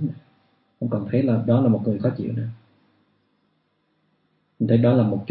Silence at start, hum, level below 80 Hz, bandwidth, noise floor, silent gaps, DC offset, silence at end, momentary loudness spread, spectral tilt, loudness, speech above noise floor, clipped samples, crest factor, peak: 0 s; none; -62 dBFS; 4.6 kHz; -69 dBFS; none; under 0.1%; 0.05 s; 13 LU; -13.5 dB/octave; -22 LUFS; 49 dB; under 0.1%; 18 dB; -6 dBFS